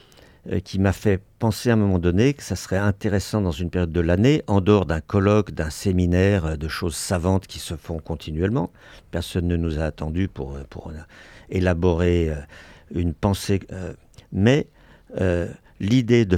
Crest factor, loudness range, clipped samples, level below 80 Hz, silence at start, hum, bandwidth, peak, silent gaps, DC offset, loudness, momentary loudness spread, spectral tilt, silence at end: 18 dB; 6 LU; under 0.1%; -42 dBFS; 0.45 s; none; 16 kHz; -4 dBFS; none; under 0.1%; -22 LUFS; 14 LU; -6.5 dB/octave; 0 s